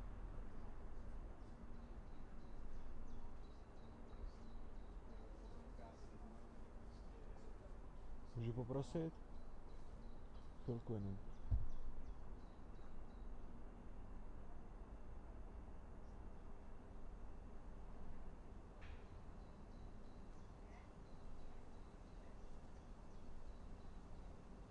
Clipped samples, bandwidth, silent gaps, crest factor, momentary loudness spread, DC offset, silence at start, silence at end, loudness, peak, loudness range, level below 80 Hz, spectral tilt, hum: under 0.1%; 8 kHz; none; 22 dB; 13 LU; under 0.1%; 0 s; 0 s; -56 LUFS; -28 dBFS; 10 LU; -54 dBFS; -8 dB/octave; none